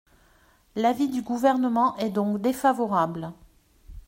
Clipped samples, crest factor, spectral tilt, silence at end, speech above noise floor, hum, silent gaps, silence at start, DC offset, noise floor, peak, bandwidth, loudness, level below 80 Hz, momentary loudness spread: under 0.1%; 18 dB; -6 dB/octave; 0.05 s; 36 dB; none; none; 0.75 s; under 0.1%; -60 dBFS; -8 dBFS; 16 kHz; -24 LUFS; -54 dBFS; 8 LU